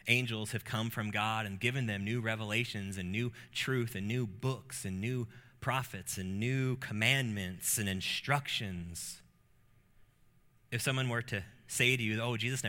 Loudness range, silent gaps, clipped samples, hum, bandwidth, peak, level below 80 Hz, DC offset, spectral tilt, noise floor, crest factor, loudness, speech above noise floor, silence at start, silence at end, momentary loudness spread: 4 LU; none; under 0.1%; none; 17 kHz; -12 dBFS; -66 dBFS; under 0.1%; -4 dB/octave; -66 dBFS; 24 dB; -34 LUFS; 31 dB; 0.05 s; 0 s; 10 LU